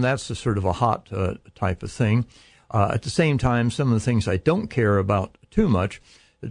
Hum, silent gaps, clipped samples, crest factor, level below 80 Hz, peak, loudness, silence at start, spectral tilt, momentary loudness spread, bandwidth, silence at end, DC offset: none; none; under 0.1%; 16 dB; -42 dBFS; -6 dBFS; -23 LUFS; 0 s; -7 dB/octave; 7 LU; 10.5 kHz; 0 s; under 0.1%